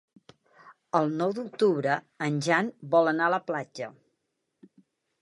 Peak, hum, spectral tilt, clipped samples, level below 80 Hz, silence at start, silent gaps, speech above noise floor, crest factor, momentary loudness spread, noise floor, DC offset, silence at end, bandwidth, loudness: -8 dBFS; none; -6 dB/octave; under 0.1%; -80 dBFS; 0.65 s; none; 53 dB; 20 dB; 10 LU; -80 dBFS; under 0.1%; 1.3 s; 11.5 kHz; -27 LUFS